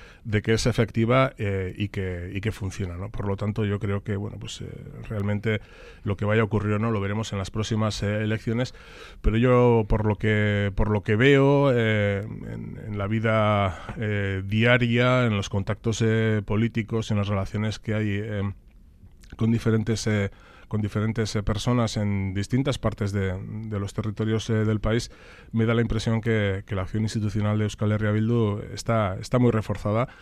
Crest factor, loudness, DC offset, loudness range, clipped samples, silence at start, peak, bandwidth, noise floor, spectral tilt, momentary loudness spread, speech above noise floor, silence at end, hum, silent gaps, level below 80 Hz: 18 dB; -25 LUFS; under 0.1%; 5 LU; under 0.1%; 0 s; -6 dBFS; 11 kHz; -50 dBFS; -6.5 dB/octave; 11 LU; 26 dB; 0 s; none; none; -40 dBFS